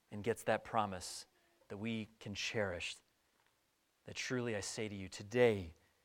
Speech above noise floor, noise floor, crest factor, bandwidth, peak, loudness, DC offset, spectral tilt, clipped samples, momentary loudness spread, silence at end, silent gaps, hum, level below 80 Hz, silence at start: 40 dB; -79 dBFS; 22 dB; 17 kHz; -18 dBFS; -39 LUFS; under 0.1%; -4.5 dB/octave; under 0.1%; 15 LU; 0.3 s; none; none; -70 dBFS; 0.1 s